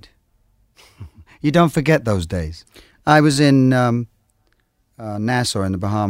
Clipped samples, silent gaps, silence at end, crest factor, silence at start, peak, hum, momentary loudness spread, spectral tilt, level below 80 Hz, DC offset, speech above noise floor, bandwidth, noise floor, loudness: under 0.1%; none; 0 s; 18 dB; 1 s; 0 dBFS; none; 17 LU; -6 dB/octave; -44 dBFS; under 0.1%; 47 dB; 16 kHz; -63 dBFS; -17 LUFS